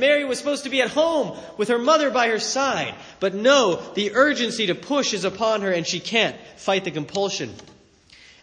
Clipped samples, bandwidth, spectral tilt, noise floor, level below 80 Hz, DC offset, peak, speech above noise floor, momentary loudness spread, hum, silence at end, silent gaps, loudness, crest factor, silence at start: under 0.1%; 10.5 kHz; -3 dB/octave; -52 dBFS; -64 dBFS; under 0.1%; -2 dBFS; 30 dB; 9 LU; none; 0.8 s; none; -21 LUFS; 20 dB; 0 s